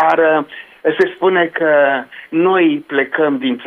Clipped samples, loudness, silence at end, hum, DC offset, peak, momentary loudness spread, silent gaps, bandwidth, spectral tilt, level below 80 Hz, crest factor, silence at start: under 0.1%; -15 LUFS; 0 s; none; under 0.1%; -2 dBFS; 8 LU; none; 6.2 kHz; -7 dB/octave; -66 dBFS; 14 dB; 0 s